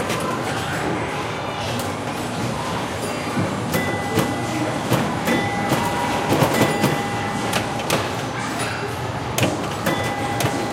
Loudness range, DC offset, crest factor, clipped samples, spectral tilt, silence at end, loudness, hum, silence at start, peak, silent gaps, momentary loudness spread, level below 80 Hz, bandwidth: 4 LU; under 0.1%; 20 dB; under 0.1%; -4.5 dB/octave; 0 s; -22 LUFS; none; 0 s; -2 dBFS; none; 6 LU; -46 dBFS; 17 kHz